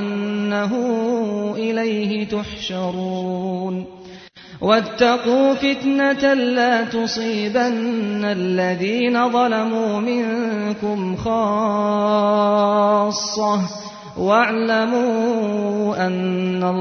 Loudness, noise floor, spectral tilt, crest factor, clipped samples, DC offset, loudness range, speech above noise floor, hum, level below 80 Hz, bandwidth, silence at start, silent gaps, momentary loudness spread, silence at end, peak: -19 LUFS; -40 dBFS; -5.5 dB/octave; 18 dB; under 0.1%; under 0.1%; 4 LU; 21 dB; none; -54 dBFS; 6.6 kHz; 0 s; none; 8 LU; 0 s; -2 dBFS